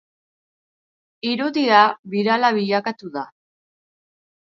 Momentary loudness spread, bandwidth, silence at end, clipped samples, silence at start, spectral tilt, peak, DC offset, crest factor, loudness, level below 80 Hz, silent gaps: 16 LU; 7.4 kHz; 1.25 s; under 0.1%; 1.25 s; -5.5 dB/octave; 0 dBFS; under 0.1%; 22 dB; -19 LUFS; -74 dBFS; 1.99-2.03 s